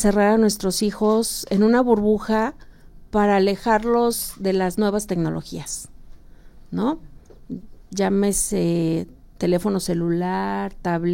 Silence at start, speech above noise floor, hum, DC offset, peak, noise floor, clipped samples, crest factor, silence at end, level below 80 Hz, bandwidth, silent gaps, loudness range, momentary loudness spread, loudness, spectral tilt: 0 s; 23 dB; none; under 0.1%; -6 dBFS; -43 dBFS; under 0.1%; 16 dB; 0 s; -42 dBFS; 16.5 kHz; none; 6 LU; 14 LU; -21 LUFS; -5 dB/octave